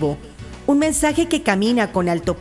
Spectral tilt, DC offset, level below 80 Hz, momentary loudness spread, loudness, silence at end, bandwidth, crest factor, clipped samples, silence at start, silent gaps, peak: -4.5 dB/octave; under 0.1%; -40 dBFS; 10 LU; -19 LUFS; 0 s; 12 kHz; 16 dB; under 0.1%; 0 s; none; -2 dBFS